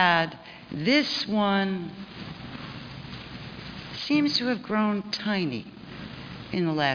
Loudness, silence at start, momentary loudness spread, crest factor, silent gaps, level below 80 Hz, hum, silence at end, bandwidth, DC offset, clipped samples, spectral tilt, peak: -26 LUFS; 0 s; 17 LU; 22 dB; none; -58 dBFS; none; 0 s; 5.4 kHz; under 0.1%; under 0.1%; -5.5 dB/octave; -6 dBFS